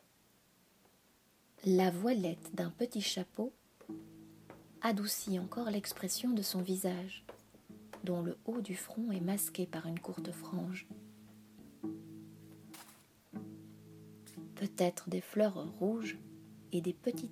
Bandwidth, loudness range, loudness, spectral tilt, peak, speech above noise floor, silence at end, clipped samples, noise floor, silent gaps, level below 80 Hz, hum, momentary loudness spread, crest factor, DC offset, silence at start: 16 kHz; 11 LU; -37 LUFS; -5 dB/octave; -18 dBFS; 33 dB; 0 s; under 0.1%; -69 dBFS; none; -78 dBFS; none; 22 LU; 20 dB; under 0.1%; 1.6 s